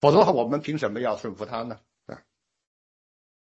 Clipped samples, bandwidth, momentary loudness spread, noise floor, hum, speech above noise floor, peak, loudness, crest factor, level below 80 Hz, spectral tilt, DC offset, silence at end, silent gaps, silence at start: under 0.1%; 8 kHz; 25 LU; -63 dBFS; none; 40 dB; -4 dBFS; -25 LUFS; 22 dB; -64 dBFS; -7 dB/octave; under 0.1%; 1.4 s; none; 0 s